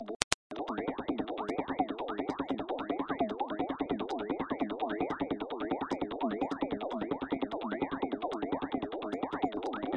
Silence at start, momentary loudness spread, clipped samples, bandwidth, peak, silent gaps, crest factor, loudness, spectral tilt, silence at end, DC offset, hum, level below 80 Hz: 0 s; 2 LU; under 0.1%; 10 kHz; 0 dBFS; 0.16-0.50 s; 36 dB; -35 LUFS; -4.5 dB/octave; 0 s; under 0.1%; none; -62 dBFS